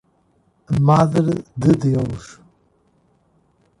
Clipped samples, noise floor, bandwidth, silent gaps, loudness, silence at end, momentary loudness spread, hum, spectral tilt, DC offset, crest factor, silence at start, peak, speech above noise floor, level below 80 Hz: under 0.1%; -61 dBFS; 11 kHz; none; -18 LUFS; 1.5 s; 10 LU; none; -8.5 dB/octave; under 0.1%; 18 dB; 0.7 s; -4 dBFS; 44 dB; -46 dBFS